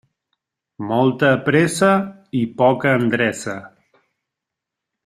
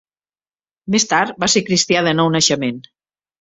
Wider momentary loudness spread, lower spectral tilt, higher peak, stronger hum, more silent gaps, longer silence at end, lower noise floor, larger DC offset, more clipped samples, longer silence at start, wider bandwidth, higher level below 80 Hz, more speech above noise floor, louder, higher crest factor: first, 13 LU vs 10 LU; first, -5.5 dB/octave vs -3 dB/octave; about the same, 0 dBFS vs -2 dBFS; neither; neither; first, 1.4 s vs 0.6 s; second, -83 dBFS vs under -90 dBFS; neither; neither; about the same, 0.8 s vs 0.85 s; first, 14 kHz vs 8.4 kHz; about the same, -60 dBFS vs -56 dBFS; second, 66 dB vs over 74 dB; about the same, -18 LUFS vs -16 LUFS; about the same, 18 dB vs 16 dB